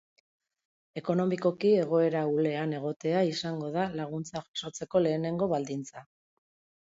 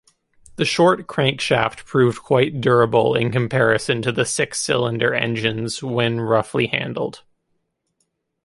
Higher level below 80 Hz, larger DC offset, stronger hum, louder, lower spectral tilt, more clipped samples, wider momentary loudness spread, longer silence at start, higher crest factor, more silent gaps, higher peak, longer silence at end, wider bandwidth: second, -70 dBFS vs -54 dBFS; neither; neither; second, -30 LUFS vs -19 LUFS; first, -6.5 dB/octave vs -5 dB/octave; neither; first, 11 LU vs 6 LU; first, 0.95 s vs 0.55 s; about the same, 16 dB vs 18 dB; first, 2.96-3.00 s, 4.48-4.54 s vs none; second, -14 dBFS vs -2 dBFS; second, 0.8 s vs 1.3 s; second, 8 kHz vs 11.5 kHz